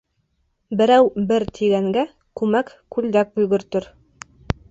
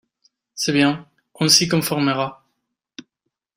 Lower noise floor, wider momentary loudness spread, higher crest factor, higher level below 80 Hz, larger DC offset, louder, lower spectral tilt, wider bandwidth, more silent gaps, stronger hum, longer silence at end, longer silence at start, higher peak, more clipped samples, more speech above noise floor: second, -68 dBFS vs -79 dBFS; about the same, 12 LU vs 14 LU; about the same, 20 dB vs 22 dB; first, -44 dBFS vs -60 dBFS; neither; about the same, -20 LUFS vs -18 LUFS; first, -6.5 dB/octave vs -3.5 dB/octave; second, 8 kHz vs 16 kHz; neither; neither; second, 0.85 s vs 1.25 s; first, 0.7 s vs 0.55 s; about the same, 0 dBFS vs 0 dBFS; neither; second, 50 dB vs 60 dB